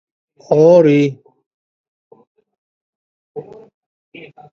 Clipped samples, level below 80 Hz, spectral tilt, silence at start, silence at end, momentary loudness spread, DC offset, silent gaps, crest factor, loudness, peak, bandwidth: under 0.1%; -66 dBFS; -8 dB/octave; 0.5 s; 1.1 s; 25 LU; under 0.1%; 1.46-2.11 s, 2.27-2.35 s, 2.58-3.35 s; 18 dB; -12 LUFS; 0 dBFS; 6.8 kHz